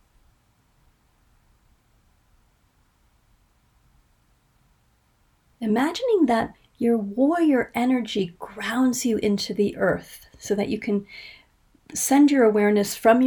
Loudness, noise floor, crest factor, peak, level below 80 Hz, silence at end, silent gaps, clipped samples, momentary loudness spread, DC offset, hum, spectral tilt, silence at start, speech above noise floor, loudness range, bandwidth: -22 LUFS; -64 dBFS; 18 dB; -6 dBFS; -58 dBFS; 0 s; none; under 0.1%; 14 LU; under 0.1%; none; -4.5 dB/octave; 5.6 s; 42 dB; 4 LU; 19 kHz